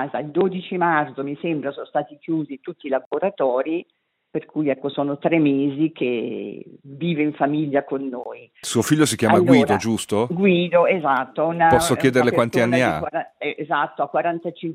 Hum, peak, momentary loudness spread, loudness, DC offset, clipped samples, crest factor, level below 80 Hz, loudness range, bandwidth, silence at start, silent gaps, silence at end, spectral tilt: none; 0 dBFS; 12 LU; -21 LUFS; under 0.1%; under 0.1%; 20 dB; -56 dBFS; 7 LU; 15.5 kHz; 0 s; 3.06-3.11 s; 0 s; -5.5 dB/octave